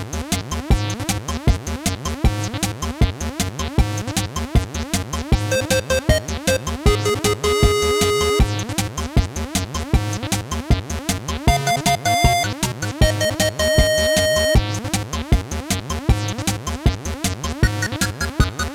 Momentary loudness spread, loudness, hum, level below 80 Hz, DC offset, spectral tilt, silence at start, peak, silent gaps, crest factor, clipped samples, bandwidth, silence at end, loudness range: 7 LU; -20 LUFS; none; -24 dBFS; under 0.1%; -4.5 dB/octave; 0 s; 0 dBFS; none; 18 dB; under 0.1%; 16 kHz; 0 s; 4 LU